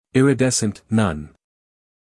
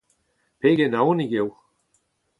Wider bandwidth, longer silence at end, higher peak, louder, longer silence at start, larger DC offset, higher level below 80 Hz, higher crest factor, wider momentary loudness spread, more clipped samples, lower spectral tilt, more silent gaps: first, 12 kHz vs 10.5 kHz; about the same, 0.9 s vs 0.9 s; about the same, -4 dBFS vs -6 dBFS; first, -19 LUFS vs -22 LUFS; second, 0.15 s vs 0.65 s; neither; first, -50 dBFS vs -68 dBFS; about the same, 18 dB vs 18 dB; about the same, 7 LU vs 7 LU; neither; second, -5 dB/octave vs -8 dB/octave; neither